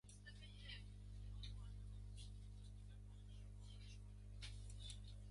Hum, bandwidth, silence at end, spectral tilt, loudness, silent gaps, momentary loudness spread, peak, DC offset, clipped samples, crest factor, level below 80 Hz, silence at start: 50 Hz at -55 dBFS; 11.5 kHz; 0 s; -4.5 dB/octave; -58 LUFS; none; 5 LU; -40 dBFS; under 0.1%; under 0.1%; 16 dB; -58 dBFS; 0.05 s